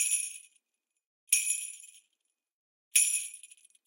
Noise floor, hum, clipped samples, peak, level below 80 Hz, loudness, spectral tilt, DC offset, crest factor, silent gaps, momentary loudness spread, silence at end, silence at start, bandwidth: -85 dBFS; none; under 0.1%; -8 dBFS; under -90 dBFS; -28 LUFS; 8.5 dB/octave; under 0.1%; 28 dB; 1.06-1.27 s, 2.52-2.91 s; 23 LU; 0.4 s; 0 s; 16.5 kHz